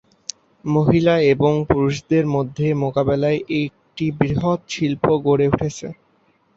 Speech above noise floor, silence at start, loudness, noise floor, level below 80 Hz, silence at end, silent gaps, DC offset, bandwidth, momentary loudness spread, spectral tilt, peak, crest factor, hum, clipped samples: 42 dB; 0.65 s; -19 LUFS; -60 dBFS; -46 dBFS; 0.65 s; none; under 0.1%; 8 kHz; 13 LU; -7 dB/octave; 0 dBFS; 18 dB; none; under 0.1%